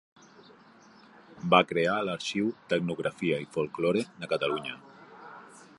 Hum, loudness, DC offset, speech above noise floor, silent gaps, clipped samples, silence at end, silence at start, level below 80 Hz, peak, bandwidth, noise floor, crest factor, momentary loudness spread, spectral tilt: none; -29 LUFS; under 0.1%; 27 dB; none; under 0.1%; 0.2 s; 1.3 s; -68 dBFS; -6 dBFS; 11.5 kHz; -56 dBFS; 24 dB; 24 LU; -5.5 dB/octave